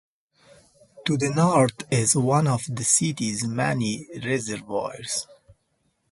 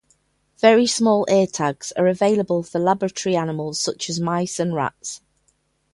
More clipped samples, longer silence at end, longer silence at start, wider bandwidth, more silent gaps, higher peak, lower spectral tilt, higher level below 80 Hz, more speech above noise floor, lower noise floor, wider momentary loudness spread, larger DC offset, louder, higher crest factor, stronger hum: neither; about the same, 0.8 s vs 0.75 s; first, 0.95 s vs 0.65 s; about the same, 11.5 kHz vs 11.5 kHz; neither; second, -6 dBFS vs 0 dBFS; about the same, -4.5 dB/octave vs -4.5 dB/octave; about the same, -60 dBFS vs -62 dBFS; about the same, 48 dB vs 46 dB; first, -71 dBFS vs -66 dBFS; about the same, 10 LU vs 9 LU; neither; second, -23 LUFS vs -20 LUFS; about the same, 18 dB vs 20 dB; neither